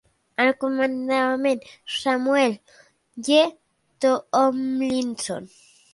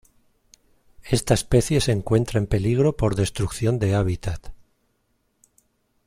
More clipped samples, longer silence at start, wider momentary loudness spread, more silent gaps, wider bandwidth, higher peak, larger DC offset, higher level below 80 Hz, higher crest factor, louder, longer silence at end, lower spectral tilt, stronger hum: neither; second, 0.4 s vs 1 s; first, 11 LU vs 6 LU; neither; second, 11.5 kHz vs 16 kHz; about the same, -4 dBFS vs -4 dBFS; neither; second, -68 dBFS vs -38 dBFS; about the same, 18 dB vs 18 dB; about the same, -22 LUFS vs -22 LUFS; second, 0.45 s vs 1.5 s; second, -3 dB/octave vs -6 dB/octave; neither